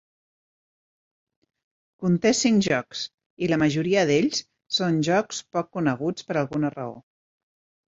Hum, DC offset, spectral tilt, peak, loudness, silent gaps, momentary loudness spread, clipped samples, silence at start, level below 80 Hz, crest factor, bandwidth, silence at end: none; under 0.1%; -5 dB/octave; -6 dBFS; -24 LUFS; 3.14-3.18 s, 3.26-3.37 s; 10 LU; under 0.1%; 2 s; -62 dBFS; 18 dB; 8 kHz; 0.95 s